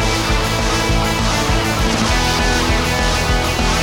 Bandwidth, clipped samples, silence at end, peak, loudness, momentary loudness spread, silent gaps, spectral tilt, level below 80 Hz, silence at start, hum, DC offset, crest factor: 18 kHz; under 0.1%; 0 s; -4 dBFS; -16 LUFS; 1 LU; none; -4 dB/octave; -22 dBFS; 0 s; none; under 0.1%; 12 dB